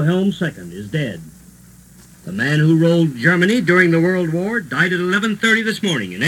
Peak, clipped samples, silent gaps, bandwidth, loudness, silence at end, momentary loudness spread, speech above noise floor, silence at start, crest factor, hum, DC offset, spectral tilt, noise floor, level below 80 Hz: 0 dBFS; under 0.1%; none; 15.5 kHz; -16 LUFS; 0 s; 12 LU; 28 dB; 0 s; 16 dB; none; under 0.1%; -6 dB/octave; -44 dBFS; -54 dBFS